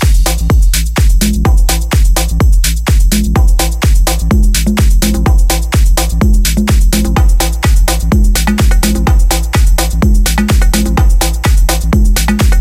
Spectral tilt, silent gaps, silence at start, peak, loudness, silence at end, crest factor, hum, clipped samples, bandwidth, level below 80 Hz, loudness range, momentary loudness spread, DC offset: -4.5 dB/octave; none; 0 s; 0 dBFS; -11 LUFS; 0 s; 8 dB; none; under 0.1%; 16 kHz; -8 dBFS; 0 LU; 1 LU; under 0.1%